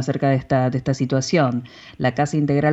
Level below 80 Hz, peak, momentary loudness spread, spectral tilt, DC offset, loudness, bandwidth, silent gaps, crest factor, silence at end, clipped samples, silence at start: -50 dBFS; -6 dBFS; 5 LU; -6.5 dB/octave; under 0.1%; -20 LUFS; 8.2 kHz; none; 14 dB; 0 s; under 0.1%; 0 s